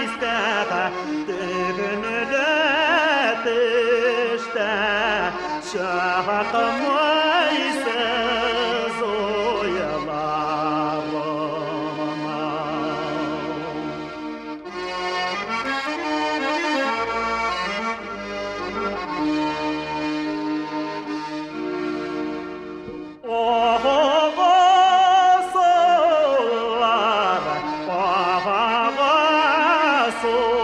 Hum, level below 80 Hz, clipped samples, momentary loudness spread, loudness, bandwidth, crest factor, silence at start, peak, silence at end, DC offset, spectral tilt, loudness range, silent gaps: none; -54 dBFS; under 0.1%; 11 LU; -21 LUFS; 11 kHz; 16 dB; 0 s; -6 dBFS; 0 s; under 0.1%; -4 dB/octave; 10 LU; none